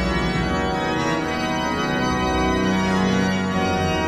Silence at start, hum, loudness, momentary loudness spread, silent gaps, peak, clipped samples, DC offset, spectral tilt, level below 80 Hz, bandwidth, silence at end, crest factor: 0 s; none; -21 LUFS; 3 LU; none; -8 dBFS; under 0.1%; under 0.1%; -5.5 dB/octave; -34 dBFS; 13 kHz; 0 s; 12 dB